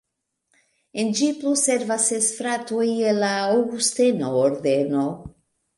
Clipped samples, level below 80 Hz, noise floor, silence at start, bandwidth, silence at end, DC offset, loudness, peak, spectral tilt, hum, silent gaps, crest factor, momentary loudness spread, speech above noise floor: under 0.1%; -62 dBFS; -75 dBFS; 0.95 s; 11.5 kHz; 0.45 s; under 0.1%; -21 LUFS; -6 dBFS; -3.5 dB/octave; none; none; 16 dB; 6 LU; 54 dB